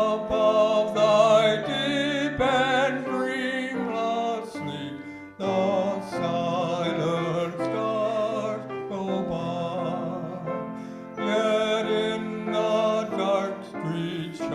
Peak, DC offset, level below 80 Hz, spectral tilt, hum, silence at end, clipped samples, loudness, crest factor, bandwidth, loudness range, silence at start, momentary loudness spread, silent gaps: -8 dBFS; under 0.1%; -58 dBFS; -5.5 dB/octave; none; 0 s; under 0.1%; -25 LUFS; 18 dB; 11.5 kHz; 6 LU; 0 s; 12 LU; none